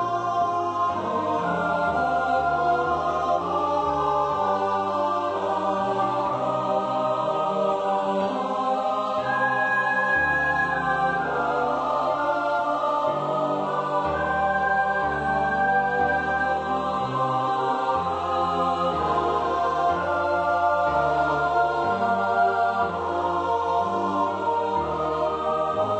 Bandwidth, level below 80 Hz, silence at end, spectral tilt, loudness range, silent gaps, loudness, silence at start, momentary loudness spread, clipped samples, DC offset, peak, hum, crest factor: 8.6 kHz; -50 dBFS; 0 s; -6 dB/octave; 2 LU; none; -24 LUFS; 0 s; 3 LU; under 0.1%; under 0.1%; -10 dBFS; none; 14 dB